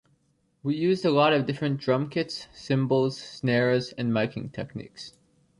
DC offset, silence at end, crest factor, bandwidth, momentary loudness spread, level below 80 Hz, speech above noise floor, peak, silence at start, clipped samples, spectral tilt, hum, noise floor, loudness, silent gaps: under 0.1%; 0.5 s; 18 dB; 11 kHz; 15 LU; -64 dBFS; 43 dB; -8 dBFS; 0.65 s; under 0.1%; -6.5 dB/octave; none; -69 dBFS; -26 LUFS; none